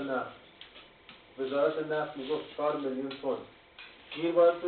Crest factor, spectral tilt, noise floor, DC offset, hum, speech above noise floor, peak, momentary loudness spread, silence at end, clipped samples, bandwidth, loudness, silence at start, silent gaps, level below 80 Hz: 18 dB; -3.5 dB/octave; -55 dBFS; under 0.1%; none; 25 dB; -14 dBFS; 21 LU; 0 s; under 0.1%; 4.5 kHz; -32 LUFS; 0 s; none; -72 dBFS